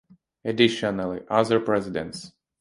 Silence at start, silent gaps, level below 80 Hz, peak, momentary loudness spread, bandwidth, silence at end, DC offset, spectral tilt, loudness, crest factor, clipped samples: 0.45 s; none; -58 dBFS; -4 dBFS; 14 LU; 11.5 kHz; 0.3 s; under 0.1%; -5.5 dB/octave; -24 LUFS; 22 dB; under 0.1%